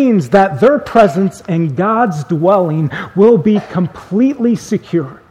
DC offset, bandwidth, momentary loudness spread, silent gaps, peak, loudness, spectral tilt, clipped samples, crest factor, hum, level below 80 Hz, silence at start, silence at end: under 0.1%; 12.5 kHz; 8 LU; none; 0 dBFS; -13 LUFS; -8 dB/octave; 0.2%; 12 dB; none; -48 dBFS; 0 s; 0.15 s